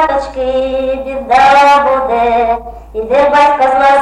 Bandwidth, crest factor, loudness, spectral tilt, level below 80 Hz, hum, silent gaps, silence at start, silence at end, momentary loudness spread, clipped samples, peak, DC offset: 11.5 kHz; 10 dB; -10 LUFS; -4 dB/octave; -34 dBFS; none; none; 0 s; 0 s; 11 LU; under 0.1%; 0 dBFS; under 0.1%